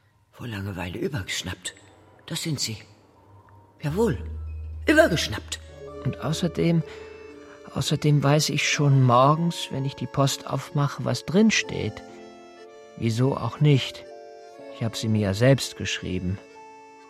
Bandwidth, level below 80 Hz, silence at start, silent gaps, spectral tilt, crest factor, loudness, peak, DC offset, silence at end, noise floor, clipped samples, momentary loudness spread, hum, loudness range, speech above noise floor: 15 kHz; -46 dBFS; 0.4 s; none; -5 dB/octave; 20 dB; -24 LUFS; -4 dBFS; under 0.1%; 0.2 s; -53 dBFS; under 0.1%; 22 LU; none; 9 LU; 30 dB